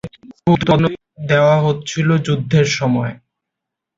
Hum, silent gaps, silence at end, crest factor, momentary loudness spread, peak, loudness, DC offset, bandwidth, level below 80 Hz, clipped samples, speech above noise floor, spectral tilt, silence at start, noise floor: none; none; 0.8 s; 16 dB; 9 LU; 0 dBFS; -16 LUFS; under 0.1%; 7.6 kHz; -46 dBFS; under 0.1%; 67 dB; -6 dB/octave; 0.05 s; -81 dBFS